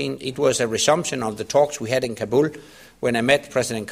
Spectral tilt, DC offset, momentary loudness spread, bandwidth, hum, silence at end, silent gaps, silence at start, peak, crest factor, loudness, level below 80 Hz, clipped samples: -3.5 dB/octave; under 0.1%; 7 LU; 15.5 kHz; none; 0 s; none; 0 s; -2 dBFS; 20 dB; -21 LUFS; -56 dBFS; under 0.1%